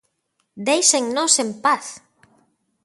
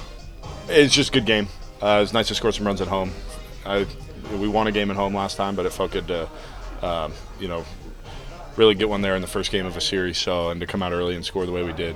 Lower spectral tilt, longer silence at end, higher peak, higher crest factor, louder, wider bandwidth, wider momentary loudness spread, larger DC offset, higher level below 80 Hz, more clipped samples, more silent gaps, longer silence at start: second, -1 dB/octave vs -4 dB/octave; first, 0.85 s vs 0 s; about the same, 0 dBFS vs -2 dBFS; about the same, 22 dB vs 22 dB; first, -18 LUFS vs -22 LUFS; second, 12 kHz vs 15.5 kHz; second, 11 LU vs 20 LU; neither; second, -74 dBFS vs -38 dBFS; neither; neither; first, 0.55 s vs 0 s